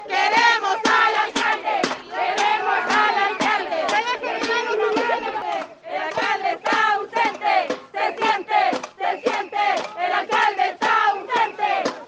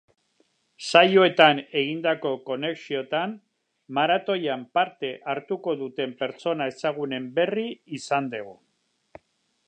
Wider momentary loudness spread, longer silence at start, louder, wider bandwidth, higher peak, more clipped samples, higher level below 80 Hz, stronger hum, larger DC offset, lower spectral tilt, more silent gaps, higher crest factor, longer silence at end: second, 8 LU vs 15 LU; second, 0 s vs 0.8 s; first, -20 LUFS vs -24 LUFS; about the same, 9.8 kHz vs 9.8 kHz; about the same, -4 dBFS vs -2 dBFS; neither; first, -68 dBFS vs -78 dBFS; neither; neither; second, -2 dB/octave vs -4.5 dB/octave; neither; second, 18 dB vs 24 dB; second, 0 s vs 1.15 s